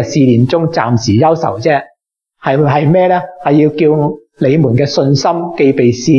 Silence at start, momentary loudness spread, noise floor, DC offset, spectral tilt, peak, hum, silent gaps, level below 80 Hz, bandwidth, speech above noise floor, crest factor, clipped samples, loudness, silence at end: 0 s; 5 LU; -62 dBFS; under 0.1%; -7 dB/octave; 0 dBFS; none; none; -50 dBFS; 7.2 kHz; 51 dB; 10 dB; under 0.1%; -11 LUFS; 0 s